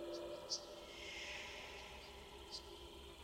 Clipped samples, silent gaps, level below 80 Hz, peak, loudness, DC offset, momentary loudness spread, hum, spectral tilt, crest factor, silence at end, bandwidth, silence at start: under 0.1%; none; -64 dBFS; -28 dBFS; -49 LUFS; under 0.1%; 10 LU; none; -2 dB/octave; 22 dB; 0 s; 16 kHz; 0 s